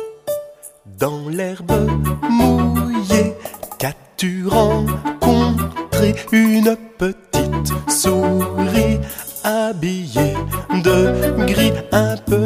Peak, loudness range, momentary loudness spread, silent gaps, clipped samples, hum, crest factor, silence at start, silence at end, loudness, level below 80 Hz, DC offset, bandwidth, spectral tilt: 0 dBFS; 2 LU; 10 LU; none; under 0.1%; none; 16 dB; 0 s; 0 s; -17 LUFS; -32 dBFS; under 0.1%; 15.5 kHz; -5.5 dB/octave